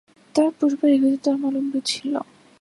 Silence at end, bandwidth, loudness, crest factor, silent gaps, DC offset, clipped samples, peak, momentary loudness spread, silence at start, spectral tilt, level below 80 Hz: 0.4 s; 11.5 kHz; -21 LUFS; 16 dB; none; under 0.1%; under 0.1%; -6 dBFS; 9 LU; 0.35 s; -3.5 dB/octave; -72 dBFS